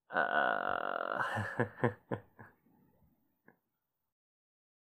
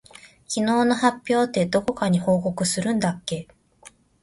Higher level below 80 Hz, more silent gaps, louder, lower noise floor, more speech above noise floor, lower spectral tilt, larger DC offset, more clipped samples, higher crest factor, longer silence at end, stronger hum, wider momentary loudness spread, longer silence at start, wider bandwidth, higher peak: second, -76 dBFS vs -56 dBFS; neither; second, -35 LUFS vs -23 LUFS; first, -87 dBFS vs -51 dBFS; first, 52 dB vs 30 dB; first, -6.5 dB/octave vs -5 dB/octave; neither; neither; first, 24 dB vs 18 dB; first, 2.35 s vs 0.35 s; neither; first, 12 LU vs 9 LU; second, 0.1 s vs 0.25 s; first, 15.5 kHz vs 11.5 kHz; second, -14 dBFS vs -4 dBFS